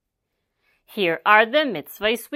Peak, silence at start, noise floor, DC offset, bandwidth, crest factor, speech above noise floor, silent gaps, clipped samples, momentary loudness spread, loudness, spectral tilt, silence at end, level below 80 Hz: 0 dBFS; 0.95 s; -78 dBFS; under 0.1%; 16 kHz; 22 dB; 58 dB; none; under 0.1%; 11 LU; -19 LUFS; -3.5 dB/octave; 0 s; -62 dBFS